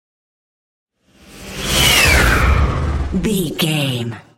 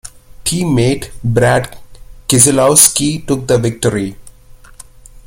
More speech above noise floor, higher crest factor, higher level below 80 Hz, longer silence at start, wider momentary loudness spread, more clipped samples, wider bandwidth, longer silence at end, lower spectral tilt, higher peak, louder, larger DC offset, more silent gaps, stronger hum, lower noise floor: about the same, 26 dB vs 26 dB; about the same, 16 dB vs 14 dB; first, -24 dBFS vs -38 dBFS; first, 1.3 s vs 0.05 s; about the same, 12 LU vs 14 LU; second, under 0.1% vs 0.2%; second, 16.5 kHz vs over 20 kHz; about the same, 0.15 s vs 0.05 s; about the same, -3.5 dB/octave vs -4 dB/octave; about the same, 0 dBFS vs 0 dBFS; second, -15 LUFS vs -12 LUFS; neither; neither; neither; first, -45 dBFS vs -38 dBFS